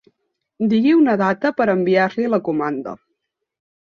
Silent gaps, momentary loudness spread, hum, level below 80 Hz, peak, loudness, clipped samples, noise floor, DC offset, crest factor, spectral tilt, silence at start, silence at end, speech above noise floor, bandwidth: none; 10 LU; none; -64 dBFS; -4 dBFS; -18 LUFS; under 0.1%; -75 dBFS; under 0.1%; 16 dB; -8 dB/octave; 0.6 s; 1.05 s; 58 dB; 6.8 kHz